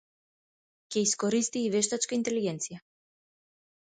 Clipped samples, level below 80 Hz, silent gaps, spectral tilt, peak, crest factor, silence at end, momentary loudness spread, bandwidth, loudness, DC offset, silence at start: under 0.1%; -74 dBFS; none; -3.5 dB/octave; -14 dBFS; 18 dB; 1.05 s; 10 LU; 9.6 kHz; -29 LUFS; under 0.1%; 0.9 s